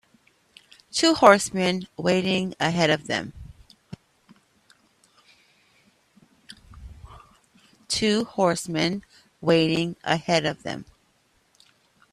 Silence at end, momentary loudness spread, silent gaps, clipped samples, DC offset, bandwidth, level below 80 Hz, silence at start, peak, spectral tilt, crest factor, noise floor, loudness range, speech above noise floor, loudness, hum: 1.3 s; 26 LU; none; under 0.1%; under 0.1%; 14.5 kHz; -56 dBFS; 0.95 s; 0 dBFS; -4.5 dB/octave; 26 dB; -65 dBFS; 9 LU; 43 dB; -23 LUFS; none